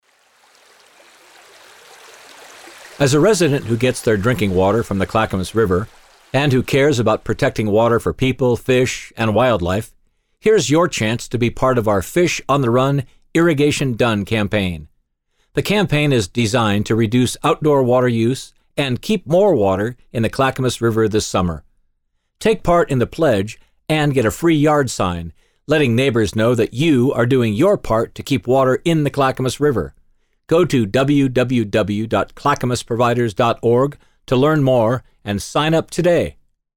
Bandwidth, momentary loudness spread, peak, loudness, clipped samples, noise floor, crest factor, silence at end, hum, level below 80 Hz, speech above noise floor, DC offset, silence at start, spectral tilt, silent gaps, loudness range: 18.5 kHz; 7 LU; -4 dBFS; -17 LUFS; under 0.1%; -67 dBFS; 14 dB; 0.45 s; none; -42 dBFS; 51 dB; under 0.1%; 2.4 s; -6 dB/octave; none; 2 LU